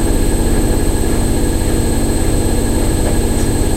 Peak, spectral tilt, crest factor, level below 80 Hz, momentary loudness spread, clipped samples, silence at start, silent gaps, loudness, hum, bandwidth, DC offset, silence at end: -2 dBFS; -5.5 dB/octave; 12 dB; -16 dBFS; 1 LU; under 0.1%; 0 s; none; -16 LUFS; none; 16 kHz; under 0.1%; 0 s